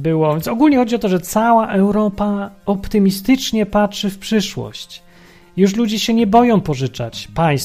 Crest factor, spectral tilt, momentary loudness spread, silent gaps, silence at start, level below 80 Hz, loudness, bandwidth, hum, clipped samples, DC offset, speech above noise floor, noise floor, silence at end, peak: 16 dB; -6 dB/octave; 11 LU; none; 0 s; -40 dBFS; -16 LUFS; 15.5 kHz; none; under 0.1%; under 0.1%; 29 dB; -45 dBFS; 0 s; 0 dBFS